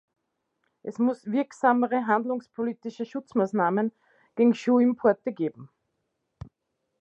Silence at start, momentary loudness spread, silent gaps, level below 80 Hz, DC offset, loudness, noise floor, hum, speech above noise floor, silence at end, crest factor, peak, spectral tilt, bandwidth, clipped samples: 0.85 s; 12 LU; none; -66 dBFS; under 0.1%; -26 LUFS; -79 dBFS; none; 55 dB; 1.35 s; 20 dB; -8 dBFS; -7.5 dB/octave; 8 kHz; under 0.1%